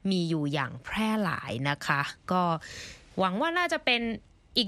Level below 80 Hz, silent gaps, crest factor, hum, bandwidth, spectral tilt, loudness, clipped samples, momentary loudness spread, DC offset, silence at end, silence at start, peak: -58 dBFS; none; 20 dB; none; 13.5 kHz; -5 dB/octave; -29 LUFS; under 0.1%; 9 LU; under 0.1%; 0 s; 0.05 s; -8 dBFS